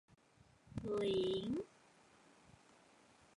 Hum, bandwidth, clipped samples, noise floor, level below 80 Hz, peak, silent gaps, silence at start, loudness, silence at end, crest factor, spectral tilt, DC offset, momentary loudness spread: none; 11 kHz; under 0.1%; -69 dBFS; -68 dBFS; -30 dBFS; none; 0.7 s; -41 LUFS; 1.7 s; 16 dB; -6.5 dB/octave; under 0.1%; 14 LU